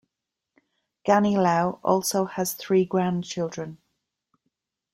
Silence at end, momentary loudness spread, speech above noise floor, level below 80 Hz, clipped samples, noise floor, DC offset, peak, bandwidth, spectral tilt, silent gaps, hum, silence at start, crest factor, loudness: 1.2 s; 11 LU; 62 dB; -66 dBFS; under 0.1%; -85 dBFS; under 0.1%; -6 dBFS; 16.5 kHz; -5.5 dB/octave; none; none; 1.05 s; 20 dB; -24 LUFS